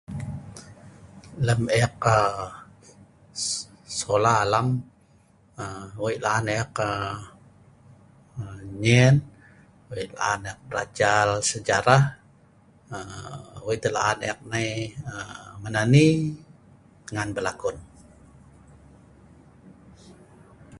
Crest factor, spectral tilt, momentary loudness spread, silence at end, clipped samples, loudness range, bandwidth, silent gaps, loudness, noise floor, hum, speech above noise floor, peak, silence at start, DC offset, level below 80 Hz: 24 dB; -5 dB/octave; 20 LU; 0 s; under 0.1%; 6 LU; 11.5 kHz; none; -24 LUFS; -58 dBFS; none; 34 dB; -2 dBFS; 0.1 s; under 0.1%; -52 dBFS